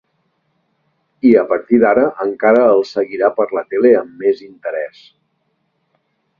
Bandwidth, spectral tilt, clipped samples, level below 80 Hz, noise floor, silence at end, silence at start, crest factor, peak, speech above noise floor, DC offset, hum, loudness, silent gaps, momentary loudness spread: 7 kHz; -7.5 dB/octave; under 0.1%; -58 dBFS; -66 dBFS; 1.55 s; 1.25 s; 16 dB; 0 dBFS; 53 dB; under 0.1%; none; -14 LUFS; none; 12 LU